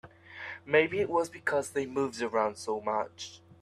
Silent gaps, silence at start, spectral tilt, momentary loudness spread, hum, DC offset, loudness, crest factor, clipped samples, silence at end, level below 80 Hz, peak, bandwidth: none; 0.05 s; -4.5 dB/octave; 17 LU; none; under 0.1%; -30 LUFS; 20 dB; under 0.1%; 0.25 s; -72 dBFS; -10 dBFS; 13 kHz